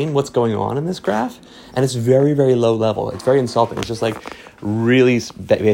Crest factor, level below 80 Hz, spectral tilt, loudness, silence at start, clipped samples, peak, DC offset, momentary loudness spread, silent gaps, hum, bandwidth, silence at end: 16 dB; -52 dBFS; -6.5 dB/octave; -18 LUFS; 0 s; under 0.1%; -2 dBFS; under 0.1%; 10 LU; none; none; 16.5 kHz; 0 s